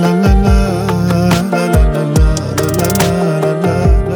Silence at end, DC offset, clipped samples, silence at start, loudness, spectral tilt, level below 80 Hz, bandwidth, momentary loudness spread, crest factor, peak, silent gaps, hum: 0 s; under 0.1%; under 0.1%; 0 s; -13 LUFS; -6.5 dB/octave; -16 dBFS; over 20 kHz; 3 LU; 12 dB; 0 dBFS; none; none